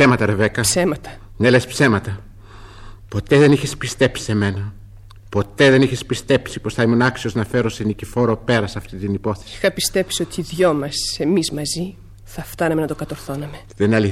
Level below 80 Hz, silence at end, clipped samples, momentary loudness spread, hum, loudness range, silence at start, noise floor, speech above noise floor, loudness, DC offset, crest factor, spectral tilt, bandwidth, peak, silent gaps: -42 dBFS; 0 s; under 0.1%; 14 LU; none; 3 LU; 0 s; -40 dBFS; 22 dB; -19 LUFS; under 0.1%; 18 dB; -5 dB/octave; 16 kHz; -2 dBFS; none